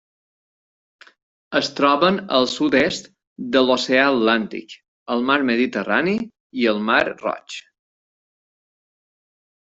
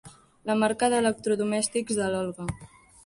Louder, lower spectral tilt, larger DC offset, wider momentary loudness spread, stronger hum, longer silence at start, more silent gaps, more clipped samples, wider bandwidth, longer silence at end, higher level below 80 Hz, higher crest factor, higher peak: first, -19 LUFS vs -26 LUFS; about the same, -4.5 dB/octave vs -4 dB/octave; neither; about the same, 15 LU vs 13 LU; neither; first, 1.5 s vs 0.05 s; first, 3.27-3.36 s, 4.88-5.06 s, 6.40-6.50 s vs none; neither; second, 8 kHz vs 11.5 kHz; first, 2.1 s vs 0.4 s; about the same, -60 dBFS vs -56 dBFS; about the same, 20 dB vs 18 dB; first, -2 dBFS vs -10 dBFS